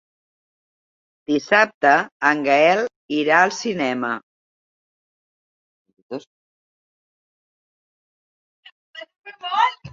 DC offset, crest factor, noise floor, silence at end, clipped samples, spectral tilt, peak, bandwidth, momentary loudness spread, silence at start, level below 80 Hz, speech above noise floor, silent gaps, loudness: under 0.1%; 22 dB; under -90 dBFS; 0.05 s; under 0.1%; -4 dB/octave; -2 dBFS; 7.6 kHz; 19 LU; 1.3 s; -68 dBFS; over 72 dB; 1.74-1.81 s, 2.12-2.20 s, 2.96-3.09 s, 4.23-5.85 s, 6.02-6.09 s, 6.27-8.63 s, 8.72-8.94 s, 9.18-9.22 s; -18 LUFS